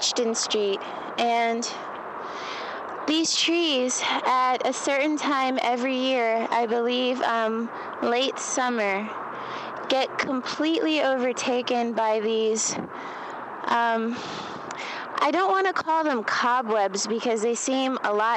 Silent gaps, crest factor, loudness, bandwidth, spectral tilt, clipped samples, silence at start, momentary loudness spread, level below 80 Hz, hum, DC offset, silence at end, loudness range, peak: none; 14 dB; -25 LUFS; 11.5 kHz; -2 dB/octave; under 0.1%; 0 s; 11 LU; -74 dBFS; none; under 0.1%; 0 s; 3 LU; -12 dBFS